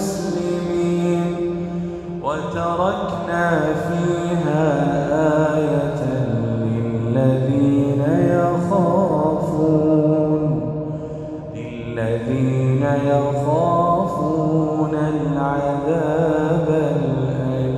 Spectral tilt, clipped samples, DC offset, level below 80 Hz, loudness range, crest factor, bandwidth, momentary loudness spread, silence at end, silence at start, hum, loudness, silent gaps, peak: -8 dB/octave; under 0.1%; under 0.1%; -46 dBFS; 4 LU; 16 dB; 12.5 kHz; 8 LU; 0 s; 0 s; none; -19 LUFS; none; -4 dBFS